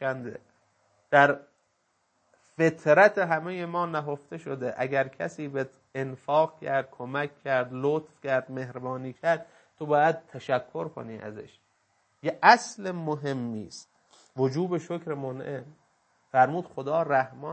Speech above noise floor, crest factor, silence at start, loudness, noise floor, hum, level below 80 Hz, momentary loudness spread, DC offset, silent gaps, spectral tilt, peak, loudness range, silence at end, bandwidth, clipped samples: 46 dB; 26 dB; 0 s; -27 LUFS; -73 dBFS; none; -76 dBFS; 17 LU; under 0.1%; none; -5.5 dB/octave; -2 dBFS; 5 LU; 0 s; 8.8 kHz; under 0.1%